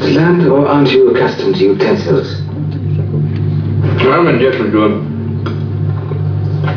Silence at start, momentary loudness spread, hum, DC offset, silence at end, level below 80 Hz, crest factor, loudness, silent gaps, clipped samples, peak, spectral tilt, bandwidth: 0 s; 9 LU; none; under 0.1%; 0 s; -48 dBFS; 10 dB; -12 LUFS; none; under 0.1%; 0 dBFS; -8.5 dB/octave; 5.4 kHz